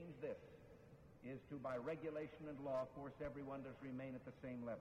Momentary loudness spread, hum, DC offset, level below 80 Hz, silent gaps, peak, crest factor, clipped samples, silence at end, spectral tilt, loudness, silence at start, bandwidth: 15 LU; none; under 0.1%; -72 dBFS; none; -34 dBFS; 16 dB; under 0.1%; 0 s; -8 dB/octave; -50 LUFS; 0 s; 14 kHz